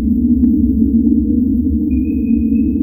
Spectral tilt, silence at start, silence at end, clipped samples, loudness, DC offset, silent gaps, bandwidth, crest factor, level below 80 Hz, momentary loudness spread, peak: -16 dB/octave; 0 s; 0 s; under 0.1%; -14 LUFS; under 0.1%; none; 2.7 kHz; 12 dB; -24 dBFS; 3 LU; -2 dBFS